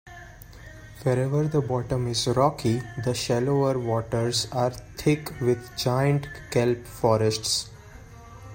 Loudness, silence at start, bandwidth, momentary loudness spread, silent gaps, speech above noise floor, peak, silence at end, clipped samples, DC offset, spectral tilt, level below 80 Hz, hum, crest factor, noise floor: -25 LUFS; 0.05 s; 16.5 kHz; 19 LU; none; 20 dB; -6 dBFS; 0 s; under 0.1%; under 0.1%; -5.5 dB/octave; -50 dBFS; none; 20 dB; -45 dBFS